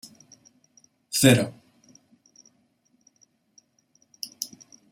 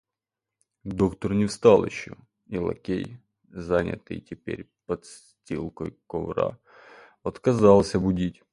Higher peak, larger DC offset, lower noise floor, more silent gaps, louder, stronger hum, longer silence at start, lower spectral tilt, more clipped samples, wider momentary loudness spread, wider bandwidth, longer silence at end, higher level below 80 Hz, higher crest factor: about the same, -4 dBFS vs -2 dBFS; neither; second, -67 dBFS vs -88 dBFS; neither; about the same, -23 LUFS vs -25 LUFS; neither; first, 1.1 s vs 0.85 s; second, -4.5 dB/octave vs -7 dB/octave; neither; about the same, 20 LU vs 19 LU; first, 16 kHz vs 11.5 kHz; first, 0.45 s vs 0.2 s; second, -66 dBFS vs -48 dBFS; about the same, 26 dB vs 22 dB